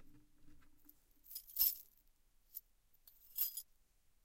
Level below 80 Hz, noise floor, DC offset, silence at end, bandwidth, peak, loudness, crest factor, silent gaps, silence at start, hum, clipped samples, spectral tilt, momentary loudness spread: -70 dBFS; -72 dBFS; under 0.1%; 0.65 s; 16.5 kHz; -20 dBFS; -39 LUFS; 28 dB; none; 0 s; none; under 0.1%; 1 dB/octave; 19 LU